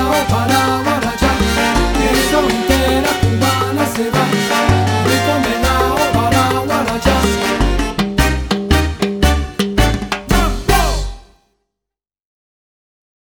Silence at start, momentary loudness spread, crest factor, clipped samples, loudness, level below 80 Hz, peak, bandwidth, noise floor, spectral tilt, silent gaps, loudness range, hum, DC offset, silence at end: 0 s; 3 LU; 14 dB; under 0.1%; -15 LUFS; -22 dBFS; 0 dBFS; over 20 kHz; -84 dBFS; -4.5 dB/octave; none; 4 LU; none; under 0.1%; 2 s